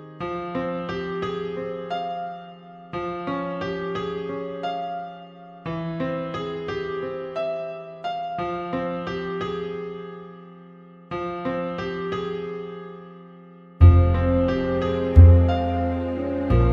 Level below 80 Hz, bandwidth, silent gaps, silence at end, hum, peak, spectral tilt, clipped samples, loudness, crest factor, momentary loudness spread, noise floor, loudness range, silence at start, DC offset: -30 dBFS; 5.4 kHz; none; 0 s; none; -2 dBFS; -9 dB/octave; under 0.1%; -24 LUFS; 22 dB; 19 LU; -46 dBFS; 12 LU; 0 s; under 0.1%